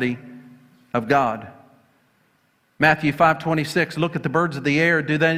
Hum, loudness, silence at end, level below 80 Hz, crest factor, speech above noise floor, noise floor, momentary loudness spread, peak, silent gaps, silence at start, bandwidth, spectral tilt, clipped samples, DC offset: none; -20 LUFS; 0 s; -56 dBFS; 20 dB; 44 dB; -64 dBFS; 9 LU; -2 dBFS; none; 0 s; 15.5 kHz; -6 dB/octave; under 0.1%; under 0.1%